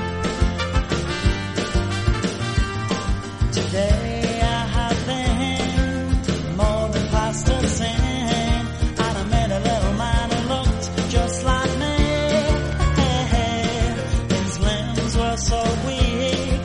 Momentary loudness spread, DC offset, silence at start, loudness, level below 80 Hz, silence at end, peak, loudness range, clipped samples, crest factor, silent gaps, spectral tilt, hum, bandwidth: 3 LU; under 0.1%; 0 s; -22 LUFS; -26 dBFS; 0 s; -4 dBFS; 2 LU; under 0.1%; 16 dB; none; -5 dB/octave; none; 11 kHz